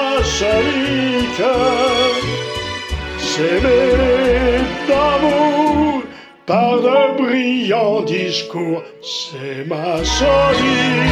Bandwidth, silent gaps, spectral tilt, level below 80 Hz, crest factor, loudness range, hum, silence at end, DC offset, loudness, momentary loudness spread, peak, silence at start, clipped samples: 12.5 kHz; none; -4.5 dB/octave; -32 dBFS; 14 dB; 3 LU; none; 0 s; under 0.1%; -16 LUFS; 10 LU; -2 dBFS; 0 s; under 0.1%